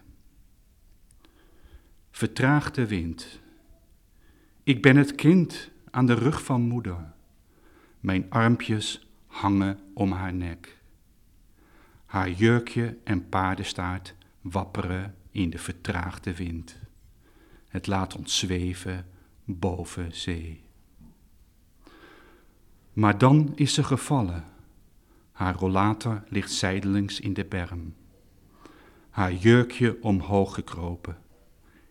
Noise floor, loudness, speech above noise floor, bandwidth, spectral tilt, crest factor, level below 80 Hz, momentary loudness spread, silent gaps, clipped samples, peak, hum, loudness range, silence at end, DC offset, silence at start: -58 dBFS; -26 LUFS; 33 dB; 15 kHz; -6 dB/octave; 24 dB; -50 dBFS; 18 LU; none; under 0.1%; -4 dBFS; none; 9 LU; 0.75 s; under 0.1%; 1.75 s